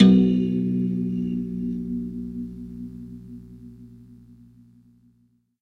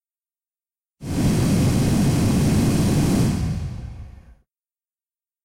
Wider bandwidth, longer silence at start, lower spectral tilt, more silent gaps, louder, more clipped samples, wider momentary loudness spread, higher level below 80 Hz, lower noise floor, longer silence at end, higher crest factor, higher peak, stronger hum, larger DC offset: second, 4.6 kHz vs 16 kHz; second, 0 s vs 1 s; first, -9 dB/octave vs -6.5 dB/octave; neither; second, -25 LUFS vs -20 LUFS; neither; first, 24 LU vs 16 LU; second, -50 dBFS vs -34 dBFS; second, -64 dBFS vs under -90 dBFS; first, 1.5 s vs 1.3 s; first, 22 dB vs 10 dB; first, -2 dBFS vs -12 dBFS; first, 60 Hz at -45 dBFS vs none; neither